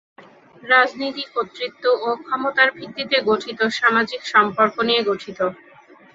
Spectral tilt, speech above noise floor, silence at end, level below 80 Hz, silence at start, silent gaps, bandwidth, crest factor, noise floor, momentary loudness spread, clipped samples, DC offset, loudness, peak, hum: -4 dB/octave; 25 dB; 0.6 s; -66 dBFS; 0.2 s; none; 7.8 kHz; 20 dB; -45 dBFS; 10 LU; under 0.1%; under 0.1%; -19 LUFS; -2 dBFS; none